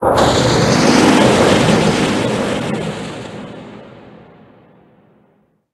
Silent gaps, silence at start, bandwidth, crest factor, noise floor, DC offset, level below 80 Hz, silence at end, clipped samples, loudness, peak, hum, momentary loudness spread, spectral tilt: none; 0 s; 12.5 kHz; 16 dB; -57 dBFS; under 0.1%; -38 dBFS; 1.75 s; under 0.1%; -13 LUFS; 0 dBFS; none; 20 LU; -5 dB/octave